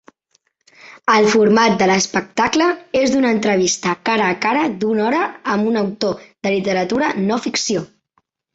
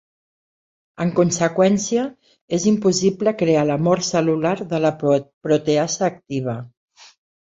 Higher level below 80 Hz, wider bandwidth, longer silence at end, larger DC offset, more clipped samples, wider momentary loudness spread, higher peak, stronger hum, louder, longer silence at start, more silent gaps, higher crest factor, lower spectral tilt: about the same, -58 dBFS vs -60 dBFS; about the same, 8.2 kHz vs 8 kHz; about the same, 0.7 s vs 0.8 s; neither; neither; about the same, 7 LU vs 8 LU; about the same, -2 dBFS vs -2 dBFS; neither; about the same, -17 LUFS vs -19 LUFS; second, 0.85 s vs 1 s; second, none vs 2.41-2.48 s, 5.33-5.41 s; about the same, 16 dB vs 18 dB; second, -4 dB/octave vs -5.5 dB/octave